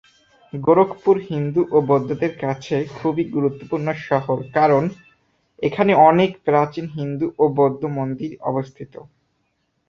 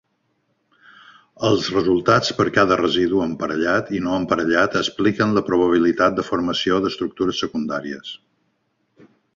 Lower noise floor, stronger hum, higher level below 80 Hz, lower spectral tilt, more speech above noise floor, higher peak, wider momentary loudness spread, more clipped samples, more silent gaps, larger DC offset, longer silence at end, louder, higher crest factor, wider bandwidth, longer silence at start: about the same, -69 dBFS vs -69 dBFS; neither; second, -58 dBFS vs -52 dBFS; first, -8.5 dB/octave vs -5 dB/octave; about the same, 50 dB vs 50 dB; about the same, -2 dBFS vs 0 dBFS; about the same, 10 LU vs 8 LU; neither; neither; neither; second, 1.05 s vs 1.2 s; about the same, -19 LUFS vs -19 LUFS; about the same, 18 dB vs 20 dB; about the same, 7.2 kHz vs 7.6 kHz; second, 0.55 s vs 1.4 s